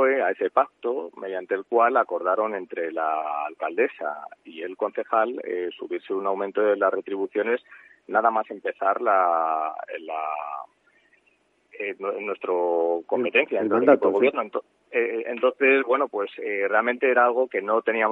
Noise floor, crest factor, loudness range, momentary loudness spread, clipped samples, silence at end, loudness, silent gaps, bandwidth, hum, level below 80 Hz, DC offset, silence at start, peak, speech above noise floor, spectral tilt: -66 dBFS; 22 dB; 6 LU; 12 LU; under 0.1%; 0 s; -24 LUFS; none; 4 kHz; 50 Hz at -80 dBFS; -84 dBFS; under 0.1%; 0 s; -2 dBFS; 42 dB; -7 dB/octave